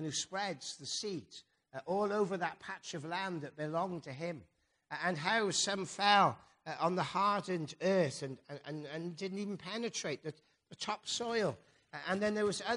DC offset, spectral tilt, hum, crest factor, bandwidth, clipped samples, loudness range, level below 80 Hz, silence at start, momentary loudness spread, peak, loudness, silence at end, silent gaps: under 0.1%; -3.5 dB/octave; none; 24 dB; 10.5 kHz; under 0.1%; 7 LU; -78 dBFS; 0 s; 14 LU; -12 dBFS; -36 LUFS; 0 s; none